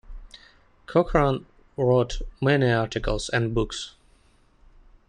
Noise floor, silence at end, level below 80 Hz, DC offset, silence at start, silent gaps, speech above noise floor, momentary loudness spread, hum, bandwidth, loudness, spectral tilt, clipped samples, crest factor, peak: -59 dBFS; 1.2 s; -38 dBFS; under 0.1%; 0.1 s; none; 36 dB; 11 LU; none; 10.5 kHz; -24 LUFS; -6 dB/octave; under 0.1%; 20 dB; -6 dBFS